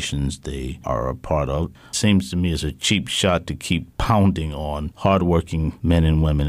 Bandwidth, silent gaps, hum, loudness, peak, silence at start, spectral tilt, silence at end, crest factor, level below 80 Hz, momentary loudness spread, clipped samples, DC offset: 15.5 kHz; none; none; -21 LUFS; -6 dBFS; 0 s; -5.5 dB/octave; 0 s; 14 dB; -32 dBFS; 9 LU; under 0.1%; under 0.1%